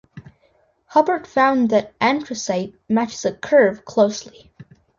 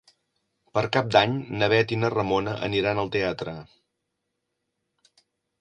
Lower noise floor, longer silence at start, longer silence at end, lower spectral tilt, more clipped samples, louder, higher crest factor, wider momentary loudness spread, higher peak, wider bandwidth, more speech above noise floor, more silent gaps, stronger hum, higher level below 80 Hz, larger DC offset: second, -61 dBFS vs -80 dBFS; second, 0.15 s vs 0.75 s; second, 0.7 s vs 1.95 s; second, -4.5 dB/octave vs -6 dB/octave; neither; first, -19 LUFS vs -24 LUFS; about the same, 18 dB vs 22 dB; about the same, 9 LU vs 9 LU; about the same, -2 dBFS vs -4 dBFS; second, 7.6 kHz vs 9.6 kHz; second, 42 dB vs 56 dB; neither; neither; about the same, -60 dBFS vs -56 dBFS; neither